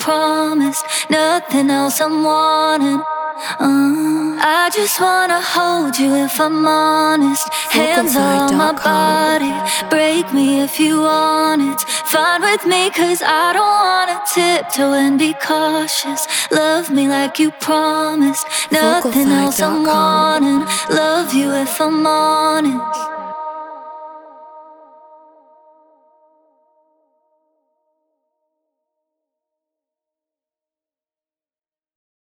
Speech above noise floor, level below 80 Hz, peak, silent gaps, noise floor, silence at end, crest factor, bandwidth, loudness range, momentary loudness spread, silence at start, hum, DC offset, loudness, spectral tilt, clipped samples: over 75 dB; -62 dBFS; 0 dBFS; none; under -90 dBFS; 7.5 s; 16 dB; over 20 kHz; 3 LU; 5 LU; 0 s; none; under 0.1%; -14 LUFS; -3 dB/octave; under 0.1%